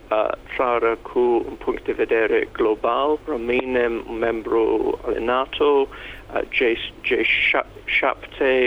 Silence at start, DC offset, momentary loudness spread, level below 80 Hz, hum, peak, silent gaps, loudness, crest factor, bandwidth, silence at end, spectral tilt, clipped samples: 0.05 s; under 0.1%; 6 LU; -46 dBFS; none; -6 dBFS; none; -21 LUFS; 16 dB; 7 kHz; 0 s; -5.5 dB/octave; under 0.1%